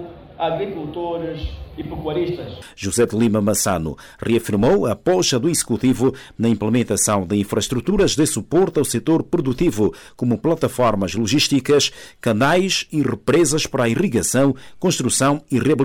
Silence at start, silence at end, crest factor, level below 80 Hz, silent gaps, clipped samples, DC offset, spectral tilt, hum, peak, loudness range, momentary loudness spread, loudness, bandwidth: 0 s; 0 s; 12 dB; -40 dBFS; none; under 0.1%; under 0.1%; -4.5 dB/octave; none; -8 dBFS; 4 LU; 9 LU; -19 LUFS; 18 kHz